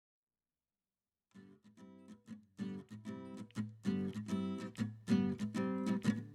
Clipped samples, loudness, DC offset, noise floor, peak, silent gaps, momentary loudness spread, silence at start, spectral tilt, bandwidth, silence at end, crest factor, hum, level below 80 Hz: under 0.1%; -40 LUFS; under 0.1%; under -90 dBFS; -20 dBFS; none; 22 LU; 1.35 s; -7 dB/octave; 12.5 kHz; 0 s; 20 dB; none; -78 dBFS